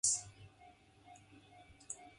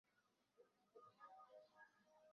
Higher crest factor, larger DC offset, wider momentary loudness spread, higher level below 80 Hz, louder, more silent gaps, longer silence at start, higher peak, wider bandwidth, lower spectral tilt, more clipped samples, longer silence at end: first, 26 dB vs 18 dB; neither; first, 25 LU vs 5 LU; first, -72 dBFS vs under -90 dBFS; first, -39 LUFS vs -67 LUFS; neither; about the same, 0.05 s vs 0.05 s; first, -18 dBFS vs -52 dBFS; first, 11.5 kHz vs 6.4 kHz; second, 0 dB/octave vs -1.5 dB/octave; neither; about the same, 0.1 s vs 0 s